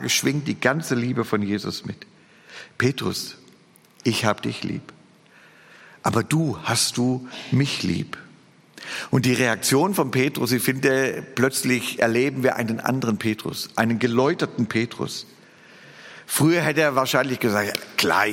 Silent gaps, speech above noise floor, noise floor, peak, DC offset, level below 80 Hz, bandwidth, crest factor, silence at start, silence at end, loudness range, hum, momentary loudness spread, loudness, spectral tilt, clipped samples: none; 32 dB; -54 dBFS; -2 dBFS; under 0.1%; -62 dBFS; 17 kHz; 20 dB; 0 s; 0 s; 6 LU; none; 13 LU; -22 LUFS; -4.5 dB/octave; under 0.1%